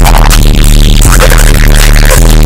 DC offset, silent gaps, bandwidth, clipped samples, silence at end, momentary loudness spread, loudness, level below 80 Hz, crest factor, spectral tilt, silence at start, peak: under 0.1%; none; 16.5 kHz; 20%; 0 s; 1 LU; -5 LUFS; -2 dBFS; 2 dB; -4 dB/octave; 0 s; 0 dBFS